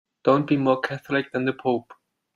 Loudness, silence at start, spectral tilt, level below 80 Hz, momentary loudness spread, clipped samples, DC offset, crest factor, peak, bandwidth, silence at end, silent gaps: -24 LUFS; 0.25 s; -7.5 dB/octave; -66 dBFS; 6 LU; under 0.1%; under 0.1%; 18 dB; -6 dBFS; 11 kHz; 0.4 s; none